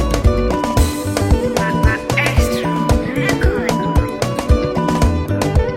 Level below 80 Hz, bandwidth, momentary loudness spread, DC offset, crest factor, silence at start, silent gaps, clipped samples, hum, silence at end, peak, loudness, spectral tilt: -20 dBFS; 16.5 kHz; 2 LU; under 0.1%; 16 dB; 0 s; none; under 0.1%; none; 0 s; 0 dBFS; -17 LUFS; -6 dB/octave